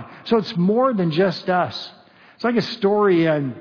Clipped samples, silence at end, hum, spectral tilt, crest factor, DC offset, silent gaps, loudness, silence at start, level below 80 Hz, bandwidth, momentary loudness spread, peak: under 0.1%; 0 s; none; -7.5 dB/octave; 14 dB; under 0.1%; none; -20 LUFS; 0 s; -66 dBFS; 5.4 kHz; 9 LU; -6 dBFS